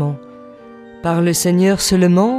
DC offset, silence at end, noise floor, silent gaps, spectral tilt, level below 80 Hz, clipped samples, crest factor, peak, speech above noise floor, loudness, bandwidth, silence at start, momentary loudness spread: under 0.1%; 0 s; -38 dBFS; none; -5.5 dB/octave; -44 dBFS; under 0.1%; 14 dB; -2 dBFS; 25 dB; -15 LUFS; 15.5 kHz; 0 s; 11 LU